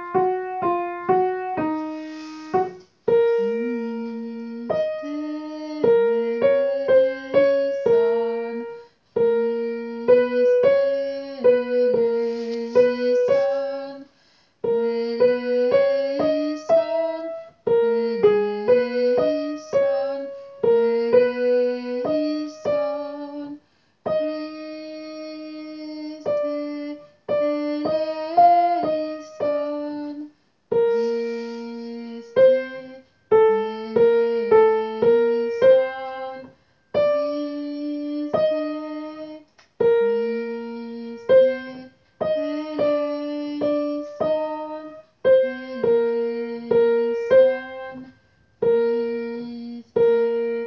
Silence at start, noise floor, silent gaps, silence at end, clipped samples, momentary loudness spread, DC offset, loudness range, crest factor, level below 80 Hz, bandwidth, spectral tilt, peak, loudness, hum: 0 s; -60 dBFS; none; 0 s; under 0.1%; 16 LU; under 0.1%; 6 LU; 16 dB; -62 dBFS; 6.4 kHz; -6.5 dB/octave; -4 dBFS; -21 LUFS; none